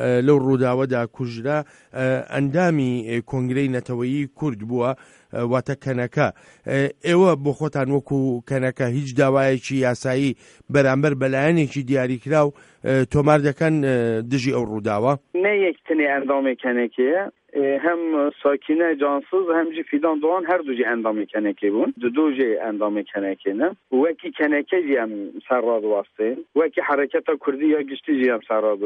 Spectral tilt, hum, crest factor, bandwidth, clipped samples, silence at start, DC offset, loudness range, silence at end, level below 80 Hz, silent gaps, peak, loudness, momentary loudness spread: -7.5 dB/octave; none; 18 dB; 11 kHz; under 0.1%; 0 s; under 0.1%; 3 LU; 0 s; -58 dBFS; none; -2 dBFS; -21 LUFS; 7 LU